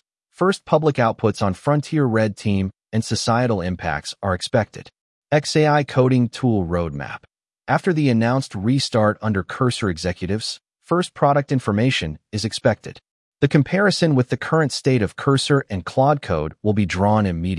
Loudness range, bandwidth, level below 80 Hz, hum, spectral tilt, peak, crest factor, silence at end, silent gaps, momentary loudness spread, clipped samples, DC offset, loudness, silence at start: 2 LU; 12 kHz; -50 dBFS; none; -6 dB/octave; -4 dBFS; 16 dB; 0 s; 5.01-5.22 s, 13.11-13.32 s; 8 LU; under 0.1%; under 0.1%; -20 LUFS; 0.4 s